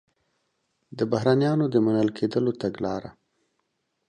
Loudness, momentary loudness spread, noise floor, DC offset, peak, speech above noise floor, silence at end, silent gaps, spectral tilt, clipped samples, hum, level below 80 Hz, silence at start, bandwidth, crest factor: -24 LUFS; 9 LU; -76 dBFS; under 0.1%; -8 dBFS; 52 dB; 1 s; none; -8 dB/octave; under 0.1%; none; -62 dBFS; 0.9 s; 9.6 kHz; 18 dB